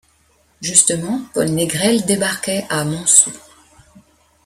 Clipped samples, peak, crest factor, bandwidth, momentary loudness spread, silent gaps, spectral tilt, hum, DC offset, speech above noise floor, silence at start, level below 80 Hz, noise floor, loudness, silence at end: under 0.1%; 0 dBFS; 18 dB; 16.5 kHz; 10 LU; none; -2.5 dB/octave; none; under 0.1%; 40 dB; 0.6 s; -54 dBFS; -57 dBFS; -15 LUFS; 1.05 s